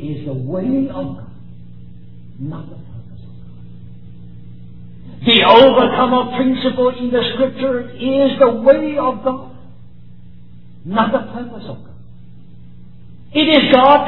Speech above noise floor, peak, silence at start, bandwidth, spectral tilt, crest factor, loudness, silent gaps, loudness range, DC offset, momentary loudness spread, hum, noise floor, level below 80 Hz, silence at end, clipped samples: 27 dB; 0 dBFS; 0 s; 5.4 kHz; -8 dB/octave; 16 dB; -14 LUFS; none; 21 LU; 2%; 23 LU; none; -41 dBFS; -46 dBFS; 0 s; under 0.1%